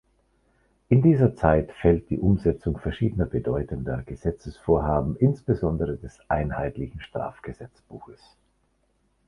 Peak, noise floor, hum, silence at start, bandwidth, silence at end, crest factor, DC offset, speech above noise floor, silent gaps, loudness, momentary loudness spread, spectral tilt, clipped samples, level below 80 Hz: -4 dBFS; -69 dBFS; none; 0.9 s; 9.8 kHz; 1.15 s; 22 dB; under 0.1%; 44 dB; none; -25 LUFS; 16 LU; -10 dB/octave; under 0.1%; -38 dBFS